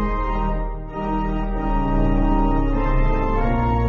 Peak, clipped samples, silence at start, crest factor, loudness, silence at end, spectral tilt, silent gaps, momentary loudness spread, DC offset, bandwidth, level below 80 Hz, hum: -8 dBFS; under 0.1%; 0 s; 12 dB; -22 LUFS; 0 s; -7.5 dB/octave; none; 6 LU; under 0.1%; 4 kHz; -22 dBFS; none